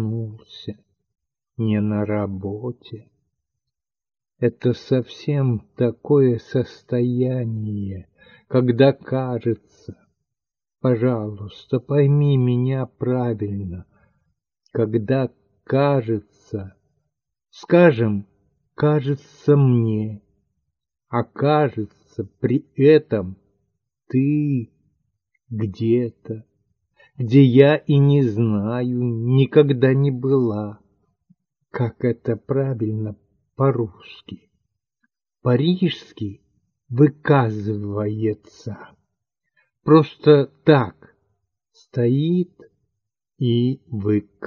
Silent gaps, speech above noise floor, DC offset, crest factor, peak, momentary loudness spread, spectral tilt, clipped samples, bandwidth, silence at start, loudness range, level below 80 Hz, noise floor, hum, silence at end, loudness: none; 69 dB; under 0.1%; 20 dB; 0 dBFS; 17 LU; -9.5 dB/octave; under 0.1%; 6.4 kHz; 0 s; 7 LU; -62 dBFS; -88 dBFS; none; 0 s; -20 LUFS